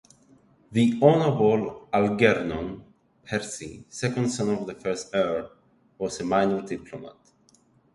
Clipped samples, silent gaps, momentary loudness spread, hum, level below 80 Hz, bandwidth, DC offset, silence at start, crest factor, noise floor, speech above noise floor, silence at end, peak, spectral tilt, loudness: under 0.1%; none; 17 LU; none; -56 dBFS; 11.5 kHz; under 0.1%; 0.7 s; 22 dB; -61 dBFS; 37 dB; 0.85 s; -4 dBFS; -6 dB/octave; -25 LUFS